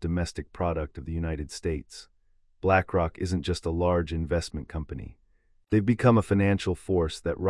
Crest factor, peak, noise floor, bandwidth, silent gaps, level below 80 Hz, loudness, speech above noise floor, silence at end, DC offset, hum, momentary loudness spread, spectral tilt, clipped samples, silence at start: 20 dB; -8 dBFS; -64 dBFS; 12 kHz; none; -44 dBFS; -27 LUFS; 37 dB; 0 s; under 0.1%; none; 14 LU; -7 dB/octave; under 0.1%; 0 s